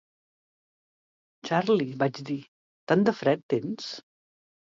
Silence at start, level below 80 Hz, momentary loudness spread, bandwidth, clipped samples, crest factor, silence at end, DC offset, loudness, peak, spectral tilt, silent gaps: 1.45 s; -76 dBFS; 13 LU; 7.6 kHz; under 0.1%; 22 dB; 0.65 s; under 0.1%; -27 LUFS; -8 dBFS; -6.5 dB/octave; 2.48-2.87 s, 3.43-3.49 s